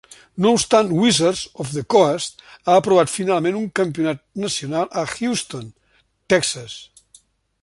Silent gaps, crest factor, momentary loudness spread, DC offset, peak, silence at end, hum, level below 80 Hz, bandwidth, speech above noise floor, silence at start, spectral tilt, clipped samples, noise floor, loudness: none; 20 dB; 14 LU; under 0.1%; 0 dBFS; 0.8 s; none; -56 dBFS; 11.5 kHz; 41 dB; 0.35 s; -4 dB/octave; under 0.1%; -60 dBFS; -19 LUFS